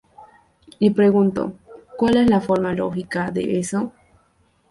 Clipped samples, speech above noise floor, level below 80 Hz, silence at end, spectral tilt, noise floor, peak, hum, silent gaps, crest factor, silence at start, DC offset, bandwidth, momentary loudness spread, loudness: under 0.1%; 42 dB; -52 dBFS; 0.8 s; -6.5 dB/octave; -61 dBFS; -4 dBFS; none; none; 16 dB; 0.2 s; under 0.1%; 11.5 kHz; 11 LU; -20 LUFS